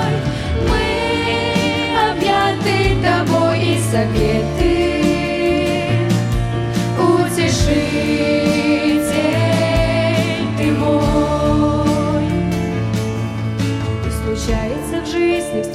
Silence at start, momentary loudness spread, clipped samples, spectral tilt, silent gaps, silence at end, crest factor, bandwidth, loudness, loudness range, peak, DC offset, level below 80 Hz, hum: 0 s; 5 LU; under 0.1%; -6 dB/octave; none; 0 s; 14 dB; 15.5 kHz; -17 LUFS; 3 LU; -2 dBFS; under 0.1%; -28 dBFS; none